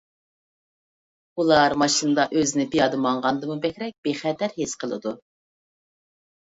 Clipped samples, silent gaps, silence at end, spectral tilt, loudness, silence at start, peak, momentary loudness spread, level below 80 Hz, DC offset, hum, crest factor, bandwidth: under 0.1%; 3.98-4.03 s; 1.35 s; -3.5 dB/octave; -23 LUFS; 1.35 s; -2 dBFS; 11 LU; -60 dBFS; under 0.1%; none; 22 dB; 8 kHz